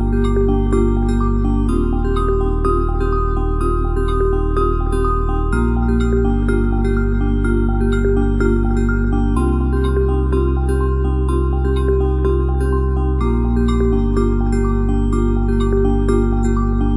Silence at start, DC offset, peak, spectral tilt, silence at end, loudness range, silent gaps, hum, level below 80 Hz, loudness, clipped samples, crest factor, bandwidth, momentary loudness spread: 0 s; under 0.1%; -4 dBFS; -9 dB/octave; 0 s; 1 LU; none; none; -18 dBFS; -18 LUFS; under 0.1%; 12 dB; 11 kHz; 2 LU